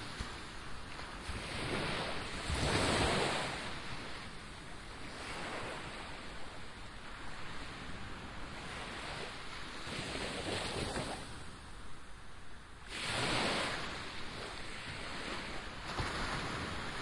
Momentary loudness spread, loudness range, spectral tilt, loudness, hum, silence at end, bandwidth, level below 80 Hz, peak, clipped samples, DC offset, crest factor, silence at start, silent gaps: 15 LU; 9 LU; -3.5 dB/octave; -40 LUFS; none; 0 s; 11.5 kHz; -52 dBFS; -20 dBFS; under 0.1%; under 0.1%; 20 dB; 0 s; none